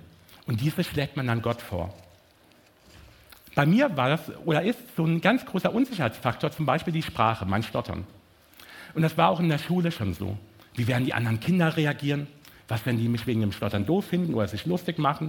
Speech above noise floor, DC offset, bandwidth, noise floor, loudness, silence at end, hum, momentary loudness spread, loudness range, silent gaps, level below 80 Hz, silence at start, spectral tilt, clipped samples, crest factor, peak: 33 dB; under 0.1%; 17.5 kHz; -58 dBFS; -26 LUFS; 0 s; none; 12 LU; 3 LU; none; -56 dBFS; 0.3 s; -7 dB/octave; under 0.1%; 22 dB; -4 dBFS